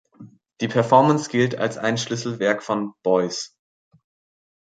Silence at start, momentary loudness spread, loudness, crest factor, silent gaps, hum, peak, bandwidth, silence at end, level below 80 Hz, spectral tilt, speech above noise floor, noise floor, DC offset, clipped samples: 0.2 s; 11 LU; -21 LUFS; 20 dB; none; none; -2 dBFS; 9.4 kHz; 1.15 s; -64 dBFS; -5 dB/octave; 26 dB; -47 dBFS; under 0.1%; under 0.1%